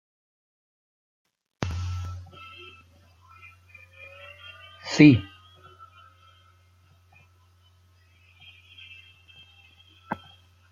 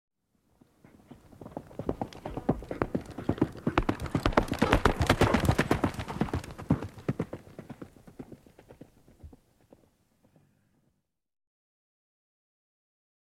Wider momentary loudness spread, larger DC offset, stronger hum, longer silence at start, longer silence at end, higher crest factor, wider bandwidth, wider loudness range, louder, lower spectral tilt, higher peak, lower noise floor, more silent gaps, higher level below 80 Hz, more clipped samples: first, 32 LU vs 22 LU; neither; neither; first, 1.6 s vs 1.1 s; second, 0.55 s vs 4 s; about the same, 28 dB vs 30 dB; second, 7.4 kHz vs 16 kHz; first, 18 LU vs 13 LU; first, -23 LUFS vs -30 LUFS; about the same, -6.5 dB/octave vs -6 dB/octave; about the same, -2 dBFS vs -2 dBFS; second, -59 dBFS vs -76 dBFS; neither; second, -58 dBFS vs -42 dBFS; neither